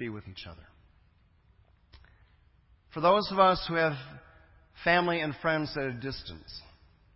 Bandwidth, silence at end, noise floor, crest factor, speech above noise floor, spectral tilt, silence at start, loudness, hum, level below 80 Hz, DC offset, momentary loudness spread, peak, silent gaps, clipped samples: 5.8 kHz; 0.55 s; -64 dBFS; 22 dB; 35 dB; -9 dB/octave; 0 s; -28 LUFS; none; -56 dBFS; under 0.1%; 21 LU; -8 dBFS; none; under 0.1%